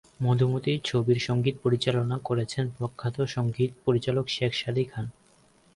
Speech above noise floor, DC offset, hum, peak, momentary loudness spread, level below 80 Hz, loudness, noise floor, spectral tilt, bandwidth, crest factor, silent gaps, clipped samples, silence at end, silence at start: 34 dB; under 0.1%; none; -12 dBFS; 7 LU; -58 dBFS; -27 LUFS; -61 dBFS; -6.5 dB/octave; 11 kHz; 16 dB; none; under 0.1%; 0.65 s; 0.2 s